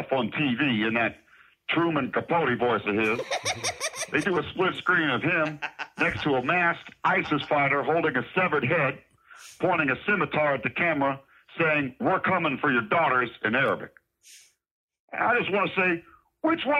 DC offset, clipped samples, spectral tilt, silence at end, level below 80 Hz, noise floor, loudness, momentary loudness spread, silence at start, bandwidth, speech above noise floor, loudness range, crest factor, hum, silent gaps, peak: under 0.1%; under 0.1%; -4.5 dB/octave; 0 s; -62 dBFS; -54 dBFS; -25 LUFS; 6 LU; 0 s; 14 kHz; 29 dB; 2 LU; 16 dB; none; 14.71-14.88 s, 15.00-15.08 s; -10 dBFS